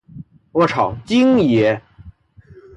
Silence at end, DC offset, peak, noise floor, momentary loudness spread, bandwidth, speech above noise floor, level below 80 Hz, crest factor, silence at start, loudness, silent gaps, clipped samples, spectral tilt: 0.65 s; under 0.1%; -4 dBFS; -46 dBFS; 9 LU; 8.6 kHz; 31 dB; -48 dBFS; 14 dB; 0.15 s; -16 LUFS; none; under 0.1%; -7 dB/octave